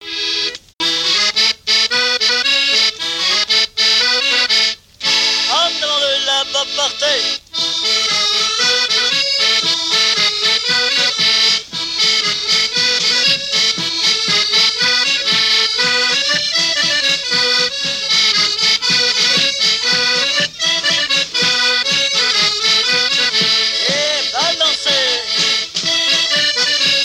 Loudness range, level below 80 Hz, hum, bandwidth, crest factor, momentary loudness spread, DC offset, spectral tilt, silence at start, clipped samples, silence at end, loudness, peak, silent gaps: 1 LU; -56 dBFS; none; 16.5 kHz; 12 dB; 4 LU; under 0.1%; 0 dB/octave; 0 s; under 0.1%; 0 s; -12 LUFS; -4 dBFS; 0.74-0.78 s